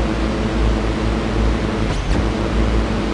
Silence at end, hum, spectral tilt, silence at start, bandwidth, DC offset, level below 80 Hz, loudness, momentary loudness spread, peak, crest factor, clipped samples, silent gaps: 0 s; none; -6.5 dB/octave; 0 s; 10.5 kHz; under 0.1%; -22 dBFS; -20 LUFS; 1 LU; -4 dBFS; 14 dB; under 0.1%; none